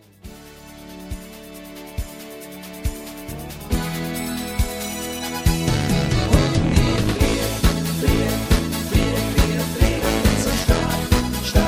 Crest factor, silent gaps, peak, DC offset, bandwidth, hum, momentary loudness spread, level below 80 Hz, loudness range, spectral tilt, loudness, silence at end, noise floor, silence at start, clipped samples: 18 dB; none; -2 dBFS; under 0.1%; 16.5 kHz; none; 17 LU; -26 dBFS; 12 LU; -5 dB/octave; -21 LUFS; 0 s; -41 dBFS; 0.25 s; under 0.1%